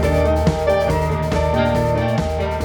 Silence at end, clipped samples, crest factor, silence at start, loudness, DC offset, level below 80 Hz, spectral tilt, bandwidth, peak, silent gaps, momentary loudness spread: 0 s; under 0.1%; 14 dB; 0 s; -18 LUFS; under 0.1%; -26 dBFS; -7 dB/octave; 19 kHz; -4 dBFS; none; 3 LU